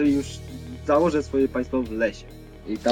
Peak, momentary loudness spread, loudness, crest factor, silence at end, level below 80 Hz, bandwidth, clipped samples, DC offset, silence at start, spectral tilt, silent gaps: -6 dBFS; 19 LU; -24 LUFS; 18 dB; 0 s; -42 dBFS; 16 kHz; under 0.1%; under 0.1%; 0 s; -6 dB/octave; none